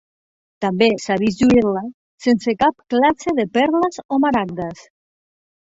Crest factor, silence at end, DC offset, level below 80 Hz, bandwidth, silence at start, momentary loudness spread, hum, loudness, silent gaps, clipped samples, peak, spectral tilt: 16 dB; 0.95 s; under 0.1%; -50 dBFS; 8 kHz; 0.6 s; 11 LU; none; -18 LUFS; 1.94-2.18 s, 4.05-4.09 s; under 0.1%; -2 dBFS; -5.5 dB/octave